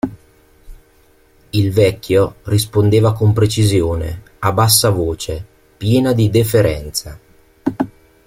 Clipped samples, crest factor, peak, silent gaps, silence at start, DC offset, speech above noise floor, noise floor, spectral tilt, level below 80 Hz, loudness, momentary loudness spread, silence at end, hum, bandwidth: under 0.1%; 16 dB; 0 dBFS; none; 0.05 s; under 0.1%; 37 dB; -51 dBFS; -5.5 dB/octave; -38 dBFS; -15 LUFS; 12 LU; 0.4 s; none; 16.5 kHz